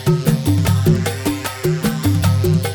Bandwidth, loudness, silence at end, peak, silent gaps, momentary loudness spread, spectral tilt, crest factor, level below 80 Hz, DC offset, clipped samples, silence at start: over 20 kHz; -17 LUFS; 0 s; -2 dBFS; none; 6 LU; -6 dB/octave; 14 dB; -36 dBFS; under 0.1%; under 0.1%; 0 s